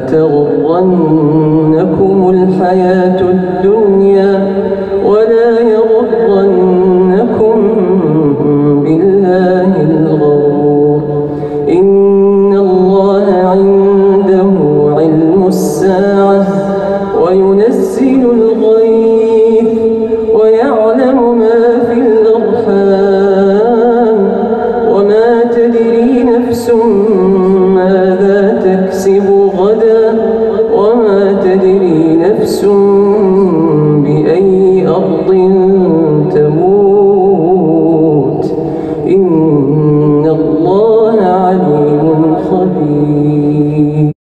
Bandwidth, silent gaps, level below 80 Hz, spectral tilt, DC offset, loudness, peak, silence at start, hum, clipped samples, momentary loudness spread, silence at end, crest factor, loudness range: 12.5 kHz; none; -42 dBFS; -8.5 dB/octave; under 0.1%; -8 LUFS; 0 dBFS; 0 s; none; under 0.1%; 3 LU; 0.1 s; 6 dB; 1 LU